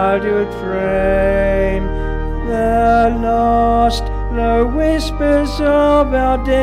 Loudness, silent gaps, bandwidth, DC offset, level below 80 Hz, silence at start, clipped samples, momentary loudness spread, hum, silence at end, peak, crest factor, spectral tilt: -15 LUFS; none; 13.5 kHz; under 0.1%; -22 dBFS; 0 s; under 0.1%; 8 LU; none; 0 s; -2 dBFS; 12 dB; -6.5 dB/octave